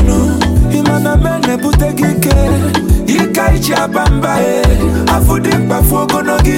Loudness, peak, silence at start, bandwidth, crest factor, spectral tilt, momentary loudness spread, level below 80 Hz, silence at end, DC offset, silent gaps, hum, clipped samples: -12 LUFS; 0 dBFS; 0 s; 17 kHz; 10 dB; -5.5 dB/octave; 2 LU; -16 dBFS; 0 s; under 0.1%; none; none; under 0.1%